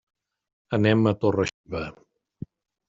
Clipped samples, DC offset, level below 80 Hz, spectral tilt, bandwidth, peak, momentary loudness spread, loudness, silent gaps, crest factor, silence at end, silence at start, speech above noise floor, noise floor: under 0.1%; under 0.1%; -56 dBFS; -6 dB/octave; 7.6 kHz; -6 dBFS; 22 LU; -24 LUFS; 1.54-1.64 s; 20 dB; 0.95 s; 0.7 s; 20 dB; -43 dBFS